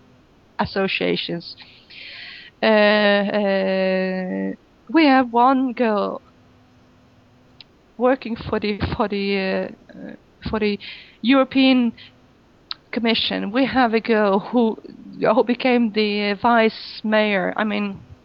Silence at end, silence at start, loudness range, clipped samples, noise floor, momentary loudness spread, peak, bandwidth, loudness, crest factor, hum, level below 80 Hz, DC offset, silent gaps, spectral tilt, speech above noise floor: 0.1 s; 0.6 s; 6 LU; under 0.1%; -53 dBFS; 19 LU; -4 dBFS; 5.8 kHz; -20 LUFS; 16 dB; none; -52 dBFS; under 0.1%; none; -8 dB/octave; 34 dB